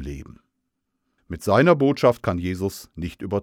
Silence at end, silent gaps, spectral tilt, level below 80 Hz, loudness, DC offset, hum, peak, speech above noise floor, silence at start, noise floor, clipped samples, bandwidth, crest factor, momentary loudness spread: 0 s; none; -7 dB/octave; -46 dBFS; -21 LUFS; under 0.1%; none; -4 dBFS; 56 dB; 0 s; -77 dBFS; under 0.1%; 17 kHz; 20 dB; 18 LU